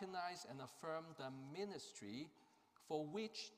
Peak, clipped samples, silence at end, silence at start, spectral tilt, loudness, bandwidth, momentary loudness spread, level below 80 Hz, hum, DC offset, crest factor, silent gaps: -30 dBFS; under 0.1%; 0 s; 0 s; -4.5 dB/octave; -50 LUFS; 15.5 kHz; 6 LU; -90 dBFS; none; under 0.1%; 20 dB; none